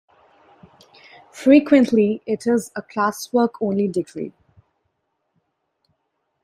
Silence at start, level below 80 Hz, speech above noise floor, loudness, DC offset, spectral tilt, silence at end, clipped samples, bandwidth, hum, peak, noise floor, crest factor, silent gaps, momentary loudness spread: 1.35 s; -64 dBFS; 55 dB; -19 LUFS; under 0.1%; -6 dB/octave; 2.15 s; under 0.1%; 14.5 kHz; none; -2 dBFS; -73 dBFS; 20 dB; none; 15 LU